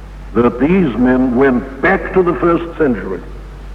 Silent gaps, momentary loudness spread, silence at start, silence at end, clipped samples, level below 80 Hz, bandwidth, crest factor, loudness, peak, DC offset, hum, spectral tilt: none; 12 LU; 0 s; 0 s; under 0.1%; -30 dBFS; 6 kHz; 14 dB; -14 LUFS; 0 dBFS; under 0.1%; none; -9 dB/octave